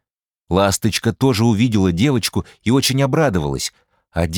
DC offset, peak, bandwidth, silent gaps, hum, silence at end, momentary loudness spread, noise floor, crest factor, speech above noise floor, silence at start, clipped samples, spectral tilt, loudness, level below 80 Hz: under 0.1%; -2 dBFS; 19.5 kHz; none; none; 0 s; 8 LU; -75 dBFS; 16 dB; 58 dB; 0.5 s; under 0.1%; -5 dB/octave; -17 LUFS; -42 dBFS